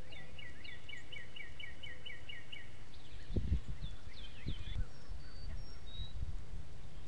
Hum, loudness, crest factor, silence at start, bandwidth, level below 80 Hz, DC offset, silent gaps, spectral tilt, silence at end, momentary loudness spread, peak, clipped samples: none; -48 LUFS; 22 dB; 0 s; 11 kHz; -46 dBFS; 2%; none; -5.5 dB/octave; 0 s; 11 LU; -22 dBFS; under 0.1%